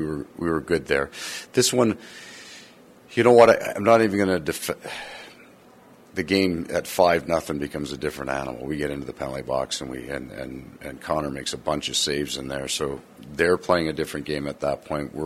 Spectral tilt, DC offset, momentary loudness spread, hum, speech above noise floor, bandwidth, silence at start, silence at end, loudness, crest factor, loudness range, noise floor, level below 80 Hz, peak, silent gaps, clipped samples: -4 dB/octave; under 0.1%; 18 LU; none; 27 dB; 16 kHz; 0 s; 0 s; -24 LUFS; 22 dB; 9 LU; -51 dBFS; -50 dBFS; -2 dBFS; none; under 0.1%